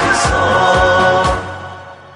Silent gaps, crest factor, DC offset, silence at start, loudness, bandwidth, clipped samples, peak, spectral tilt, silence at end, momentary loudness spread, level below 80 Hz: none; 14 dB; under 0.1%; 0 s; -12 LUFS; 11 kHz; under 0.1%; 0 dBFS; -4 dB/octave; 0.05 s; 19 LU; -30 dBFS